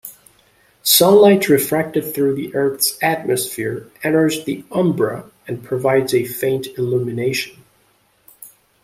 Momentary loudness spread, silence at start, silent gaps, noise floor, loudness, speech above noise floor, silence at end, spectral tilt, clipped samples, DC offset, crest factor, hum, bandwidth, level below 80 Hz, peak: 14 LU; 0.05 s; none; -58 dBFS; -17 LUFS; 42 dB; 0.35 s; -4 dB/octave; under 0.1%; under 0.1%; 18 dB; none; 16 kHz; -58 dBFS; 0 dBFS